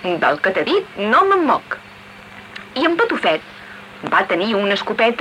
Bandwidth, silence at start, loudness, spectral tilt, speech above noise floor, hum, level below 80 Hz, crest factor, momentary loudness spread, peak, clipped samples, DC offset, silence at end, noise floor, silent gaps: 13.5 kHz; 0 s; -17 LUFS; -5 dB/octave; 22 dB; none; -60 dBFS; 14 dB; 21 LU; -4 dBFS; under 0.1%; under 0.1%; 0 s; -39 dBFS; none